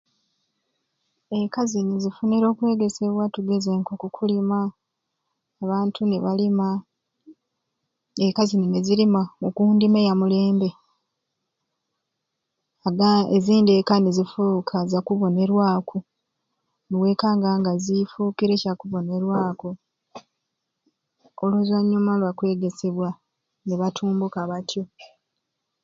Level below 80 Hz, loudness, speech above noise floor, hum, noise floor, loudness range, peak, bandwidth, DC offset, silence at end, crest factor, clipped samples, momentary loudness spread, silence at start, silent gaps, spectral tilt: -68 dBFS; -22 LUFS; 59 dB; none; -80 dBFS; 6 LU; -4 dBFS; 7.6 kHz; under 0.1%; 0.8 s; 18 dB; under 0.1%; 11 LU; 1.3 s; none; -7 dB/octave